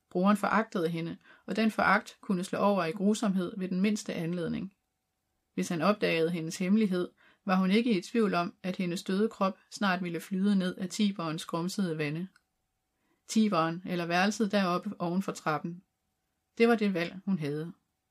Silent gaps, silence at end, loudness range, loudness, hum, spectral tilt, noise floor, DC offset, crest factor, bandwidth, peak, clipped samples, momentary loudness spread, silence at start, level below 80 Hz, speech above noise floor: none; 0.4 s; 3 LU; -30 LUFS; none; -6 dB/octave; -82 dBFS; under 0.1%; 18 dB; 14.5 kHz; -12 dBFS; under 0.1%; 9 LU; 0.15 s; -74 dBFS; 52 dB